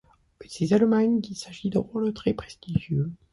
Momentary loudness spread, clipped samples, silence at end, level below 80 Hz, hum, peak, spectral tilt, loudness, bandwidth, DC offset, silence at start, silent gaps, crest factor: 12 LU; under 0.1%; 0.15 s; -52 dBFS; none; -8 dBFS; -7 dB/octave; -26 LUFS; 11.5 kHz; under 0.1%; 0.4 s; none; 16 dB